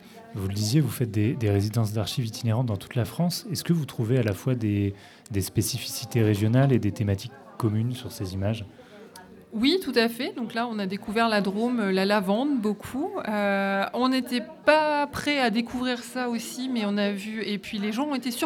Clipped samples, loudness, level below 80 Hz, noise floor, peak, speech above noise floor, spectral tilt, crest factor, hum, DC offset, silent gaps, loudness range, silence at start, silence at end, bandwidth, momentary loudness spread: under 0.1%; -26 LUFS; -62 dBFS; -47 dBFS; -4 dBFS; 22 dB; -5.5 dB/octave; 22 dB; none; under 0.1%; none; 3 LU; 0.05 s; 0 s; 18 kHz; 8 LU